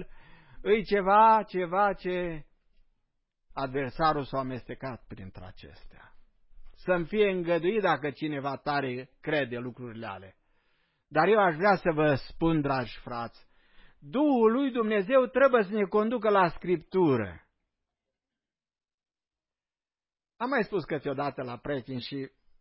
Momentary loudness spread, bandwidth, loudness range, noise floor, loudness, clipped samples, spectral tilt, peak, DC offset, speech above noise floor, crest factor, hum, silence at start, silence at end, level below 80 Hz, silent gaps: 16 LU; 5.8 kHz; 9 LU; under -90 dBFS; -27 LUFS; under 0.1%; -10.5 dB/octave; -10 dBFS; under 0.1%; over 63 dB; 20 dB; none; 0 s; 0.35 s; -56 dBFS; 18.94-18.98 s